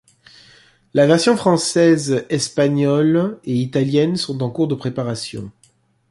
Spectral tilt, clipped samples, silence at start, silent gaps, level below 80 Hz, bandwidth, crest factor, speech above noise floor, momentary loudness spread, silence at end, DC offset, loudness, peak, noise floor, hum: -5.5 dB/octave; under 0.1%; 0.95 s; none; -58 dBFS; 11.5 kHz; 16 dB; 41 dB; 10 LU; 0.6 s; under 0.1%; -17 LUFS; -2 dBFS; -58 dBFS; none